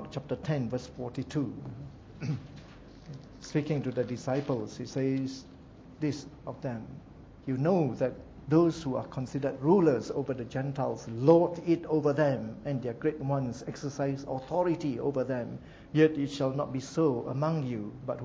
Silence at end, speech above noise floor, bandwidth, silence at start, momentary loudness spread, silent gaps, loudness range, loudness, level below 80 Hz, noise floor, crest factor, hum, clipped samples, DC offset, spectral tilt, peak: 0 s; 20 dB; 7.8 kHz; 0 s; 18 LU; none; 8 LU; -31 LUFS; -58 dBFS; -50 dBFS; 22 dB; none; under 0.1%; under 0.1%; -7.5 dB/octave; -8 dBFS